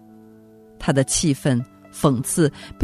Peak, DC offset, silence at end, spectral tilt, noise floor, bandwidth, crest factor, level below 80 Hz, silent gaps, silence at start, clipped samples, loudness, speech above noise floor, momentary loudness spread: -2 dBFS; under 0.1%; 0 s; -5 dB/octave; -48 dBFS; 14 kHz; 20 dB; -46 dBFS; none; 0.8 s; under 0.1%; -21 LUFS; 27 dB; 6 LU